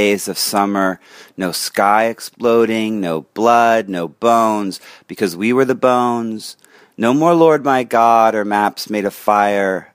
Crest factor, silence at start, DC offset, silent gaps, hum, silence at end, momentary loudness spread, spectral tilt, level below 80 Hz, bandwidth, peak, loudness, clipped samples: 16 dB; 0 s; under 0.1%; none; none; 0.1 s; 10 LU; -4.5 dB/octave; -64 dBFS; 15.5 kHz; 0 dBFS; -15 LUFS; under 0.1%